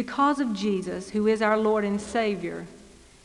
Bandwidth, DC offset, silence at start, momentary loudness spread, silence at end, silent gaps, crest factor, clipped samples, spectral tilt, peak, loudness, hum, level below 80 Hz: 11.5 kHz; under 0.1%; 0 s; 11 LU; 0.35 s; none; 16 dB; under 0.1%; -5.5 dB/octave; -10 dBFS; -25 LUFS; none; -58 dBFS